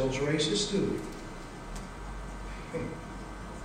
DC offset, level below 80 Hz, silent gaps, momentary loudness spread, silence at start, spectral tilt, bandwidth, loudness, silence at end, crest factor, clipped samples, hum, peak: under 0.1%; -44 dBFS; none; 15 LU; 0 s; -4.5 dB/octave; 16 kHz; -34 LUFS; 0 s; 18 dB; under 0.1%; none; -16 dBFS